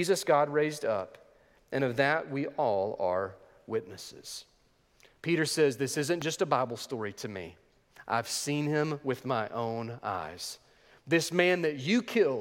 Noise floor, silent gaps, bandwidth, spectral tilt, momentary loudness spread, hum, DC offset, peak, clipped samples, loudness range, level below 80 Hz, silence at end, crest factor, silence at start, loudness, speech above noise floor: -67 dBFS; none; 17 kHz; -4.5 dB/octave; 15 LU; none; under 0.1%; -8 dBFS; under 0.1%; 3 LU; -72 dBFS; 0 s; 22 dB; 0 s; -30 LUFS; 37 dB